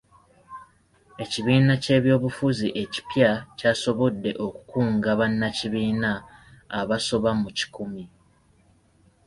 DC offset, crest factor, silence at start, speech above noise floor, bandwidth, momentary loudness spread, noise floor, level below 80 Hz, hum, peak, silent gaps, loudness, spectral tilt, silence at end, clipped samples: under 0.1%; 20 dB; 0.5 s; 37 dB; 11.5 kHz; 15 LU; -60 dBFS; -54 dBFS; none; -4 dBFS; none; -24 LUFS; -6 dB/octave; 1.2 s; under 0.1%